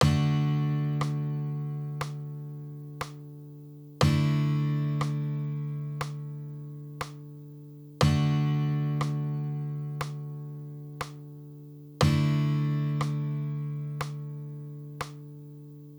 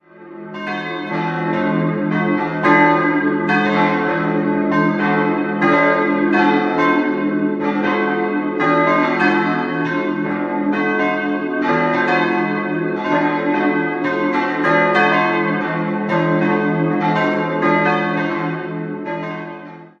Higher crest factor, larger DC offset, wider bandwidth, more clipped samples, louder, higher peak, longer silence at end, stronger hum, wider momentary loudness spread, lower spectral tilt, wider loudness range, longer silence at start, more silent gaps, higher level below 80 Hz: about the same, 20 dB vs 16 dB; neither; first, over 20 kHz vs 7 kHz; neither; second, -30 LUFS vs -17 LUFS; second, -8 dBFS vs 0 dBFS; about the same, 0 s vs 0.1 s; neither; first, 20 LU vs 9 LU; about the same, -7 dB/octave vs -7.5 dB/octave; about the same, 4 LU vs 2 LU; second, 0 s vs 0.15 s; neither; first, -52 dBFS vs -58 dBFS